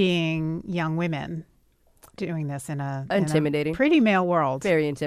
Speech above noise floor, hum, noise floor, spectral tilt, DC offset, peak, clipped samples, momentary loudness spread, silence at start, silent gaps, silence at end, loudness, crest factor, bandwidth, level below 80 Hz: 38 dB; none; -62 dBFS; -6.5 dB/octave; under 0.1%; -8 dBFS; under 0.1%; 12 LU; 0 s; none; 0 s; -24 LUFS; 16 dB; 14.5 kHz; -56 dBFS